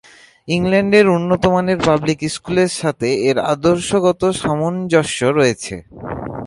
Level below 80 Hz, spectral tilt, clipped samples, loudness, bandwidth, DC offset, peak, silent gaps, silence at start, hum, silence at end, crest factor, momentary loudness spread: -44 dBFS; -5.5 dB/octave; under 0.1%; -16 LUFS; 11.5 kHz; under 0.1%; 0 dBFS; none; 0.45 s; none; 0 s; 16 dB; 10 LU